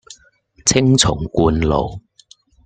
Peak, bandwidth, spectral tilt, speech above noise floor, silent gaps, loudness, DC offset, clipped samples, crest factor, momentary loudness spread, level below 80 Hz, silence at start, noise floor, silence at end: 0 dBFS; 9.4 kHz; -4.5 dB/octave; 37 dB; none; -16 LUFS; under 0.1%; under 0.1%; 18 dB; 7 LU; -34 dBFS; 0.1 s; -53 dBFS; 0.65 s